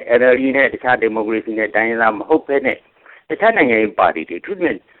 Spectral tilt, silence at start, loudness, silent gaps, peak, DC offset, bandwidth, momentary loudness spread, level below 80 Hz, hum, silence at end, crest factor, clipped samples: -8.5 dB/octave; 0 s; -16 LUFS; none; -2 dBFS; under 0.1%; 4.3 kHz; 8 LU; -56 dBFS; none; 0.2 s; 16 dB; under 0.1%